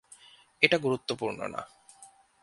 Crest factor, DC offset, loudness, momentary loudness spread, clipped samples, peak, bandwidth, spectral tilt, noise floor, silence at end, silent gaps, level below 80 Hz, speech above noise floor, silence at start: 28 dB; under 0.1%; -28 LUFS; 16 LU; under 0.1%; -4 dBFS; 11.5 kHz; -4 dB/octave; -57 dBFS; 0.35 s; none; -70 dBFS; 28 dB; 0.6 s